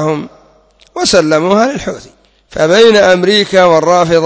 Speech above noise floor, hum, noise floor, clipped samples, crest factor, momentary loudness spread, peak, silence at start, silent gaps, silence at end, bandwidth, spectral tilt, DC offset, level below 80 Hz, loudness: 38 dB; none; -47 dBFS; 0.4%; 10 dB; 16 LU; 0 dBFS; 0 s; none; 0 s; 8 kHz; -4 dB/octave; under 0.1%; -44 dBFS; -9 LUFS